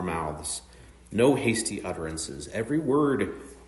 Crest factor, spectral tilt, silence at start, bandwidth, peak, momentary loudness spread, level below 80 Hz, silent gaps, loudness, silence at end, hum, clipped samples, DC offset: 18 dB; -5 dB/octave; 0 s; 11.5 kHz; -8 dBFS; 11 LU; -52 dBFS; none; -28 LUFS; 0 s; none; under 0.1%; under 0.1%